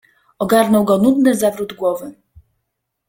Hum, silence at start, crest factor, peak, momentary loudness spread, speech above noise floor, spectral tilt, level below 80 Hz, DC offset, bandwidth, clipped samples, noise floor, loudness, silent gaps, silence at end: none; 0.4 s; 16 dB; 0 dBFS; 12 LU; 60 dB; -5.5 dB/octave; -54 dBFS; under 0.1%; 17 kHz; under 0.1%; -75 dBFS; -15 LUFS; none; 1 s